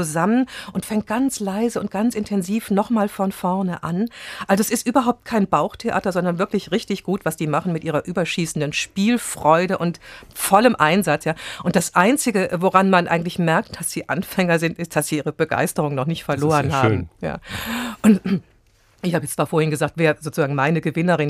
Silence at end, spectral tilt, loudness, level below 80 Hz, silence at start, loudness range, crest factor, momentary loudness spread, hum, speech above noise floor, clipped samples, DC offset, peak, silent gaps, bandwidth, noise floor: 0 s; -5.5 dB/octave; -20 LUFS; -52 dBFS; 0 s; 4 LU; 20 dB; 9 LU; none; 36 dB; under 0.1%; under 0.1%; 0 dBFS; none; 15.5 kHz; -56 dBFS